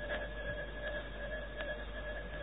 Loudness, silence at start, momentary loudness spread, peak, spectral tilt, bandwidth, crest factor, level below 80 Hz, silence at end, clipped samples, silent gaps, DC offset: -42 LUFS; 0 s; 3 LU; -22 dBFS; -3 dB/octave; 4 kHz; 20 dB; -46 dBFS; 0 s; under 0.1%; none; 0.2%